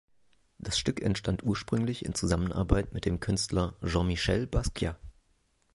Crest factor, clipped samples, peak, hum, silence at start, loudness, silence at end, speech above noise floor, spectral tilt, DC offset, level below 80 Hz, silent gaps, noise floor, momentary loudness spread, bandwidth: 20 dB; under 0.1%; -10 dBFS; none; 0.65 s; -30 LUFS; 0.65 s; 41 dB; -5 dB/octave; under 0.1%; -40 dBFS; none; -70 dBFS; 5 LU; 11.5 kHz